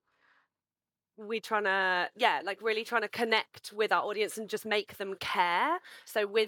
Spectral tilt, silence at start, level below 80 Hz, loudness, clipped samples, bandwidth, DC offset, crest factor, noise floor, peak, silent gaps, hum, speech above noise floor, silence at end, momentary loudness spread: -2.5 dB/octave; 1.2 s; -82 dBFS; -31 LUFS; under 0.1%; 19 kHz; under 0.1%; 22 dB; under -90 dBFS; -10 dBFS; none; none; over 59 dB; 0 s; 10 LU